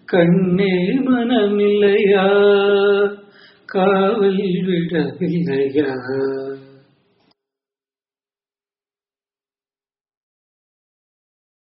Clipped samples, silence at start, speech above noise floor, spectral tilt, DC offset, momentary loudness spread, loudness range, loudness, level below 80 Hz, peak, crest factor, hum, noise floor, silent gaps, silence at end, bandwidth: under 0.1%; 0.1 s; over 74 dB; -5.5 dB/octave; under 0.1%; 9 LU; 11 LU; -16 LUFS; -60 dBFS; -2 dBFS; 16 dB; none; under -90 dBFS; none; 5.15 s; 5.2 kHz